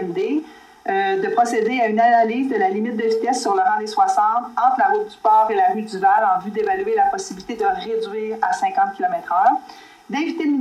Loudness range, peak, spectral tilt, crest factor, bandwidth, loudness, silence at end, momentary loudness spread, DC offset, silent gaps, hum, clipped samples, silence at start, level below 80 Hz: 3 LU; -4 dBFS; -4.5 dB/octave; 14 dB; 12.5 kHz; -19 LUFS; 0 s; 8 LU; under 0.1%; none; none; under 0.1%; 0 s; -62 dBFS